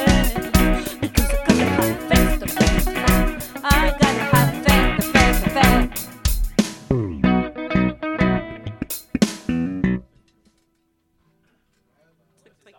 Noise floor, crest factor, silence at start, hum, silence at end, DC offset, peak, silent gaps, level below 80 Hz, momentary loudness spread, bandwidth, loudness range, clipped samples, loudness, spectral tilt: -67 dBFS; 20 dB; 0 s; none; 2.75 s; under 0.1%; 0 dBFS; none; -26 dBFS; 9 LU; 17.5 kHz; 9 LU; under 0.1%; -19 LUFS; -5 dB/octave